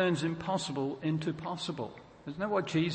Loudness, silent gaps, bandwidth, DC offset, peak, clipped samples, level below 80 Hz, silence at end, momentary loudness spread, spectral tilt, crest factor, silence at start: -34 LUFS; none; 8.8 kHz; under 0.1%; -18 dBFS; under 0.1%; -64 dBFS; 0 s; 11 LU; -6 dB/octave; 16 dB; 0 s